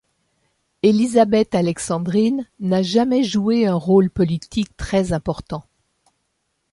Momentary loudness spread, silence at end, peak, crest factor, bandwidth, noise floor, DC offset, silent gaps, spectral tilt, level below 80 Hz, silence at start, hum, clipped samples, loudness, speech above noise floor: 9 LU; 1.1 s; -2 dBFS; 16 dB; 11.5 kHz; -72 dBFS; under 0.1%; none; -6.5 dB/octave; -44 dBFS; 0.85 s; none; under 0.1%; -19 LUFS; 54 dB